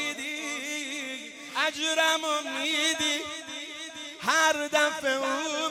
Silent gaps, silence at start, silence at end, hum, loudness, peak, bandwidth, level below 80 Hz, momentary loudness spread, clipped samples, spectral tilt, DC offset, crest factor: none; 0 s; 0 s; none; -27 LUFS; -8 dBFS; 16 kHz; -74 dBFS; 13 LU; under 0.1%; 0 dB/octave; under 0.1%; 20 dB